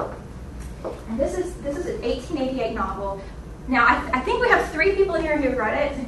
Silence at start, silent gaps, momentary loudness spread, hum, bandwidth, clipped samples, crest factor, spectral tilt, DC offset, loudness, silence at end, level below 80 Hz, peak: 0 s; none; 17 LU; none; 12.5 kHz; under 0.1%; 20 dB; -5.5 dB/octave; under 0.1%; -22 LUFS; 0 s; -38 dBFS; -2 dBFS